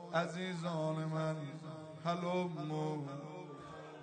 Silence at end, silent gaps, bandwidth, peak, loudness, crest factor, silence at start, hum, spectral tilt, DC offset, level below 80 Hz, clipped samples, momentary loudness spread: 0 s; none; 9 kHz; -22 dBFS; -40 LUFS; 18 dB; 0 s; none; -6.5 dB/octave; under 0.1%; -80 dBFS; under 0.1%; 12 LU